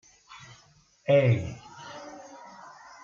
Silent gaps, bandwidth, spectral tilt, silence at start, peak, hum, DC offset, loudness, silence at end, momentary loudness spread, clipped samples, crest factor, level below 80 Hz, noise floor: none; 7.4 kHz; -7 dB/octave; 0.35 s; -10 dBFS; none; under 0.1%; -25 LUFS; 0.65 s; 26 LU; under 0.1%; 20 dB; -62 dBFS; -60 dBFS